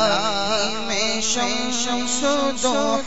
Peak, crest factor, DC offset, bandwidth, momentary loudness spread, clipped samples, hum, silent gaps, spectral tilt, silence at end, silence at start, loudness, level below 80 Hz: -6 dBFS; 16 dB; 3%; 8.2 kHz; 2 LU; under 0.1%; none; none; -1.5 dB/octave; 0 s; 0 s; -21 LUFS; -48 dBFS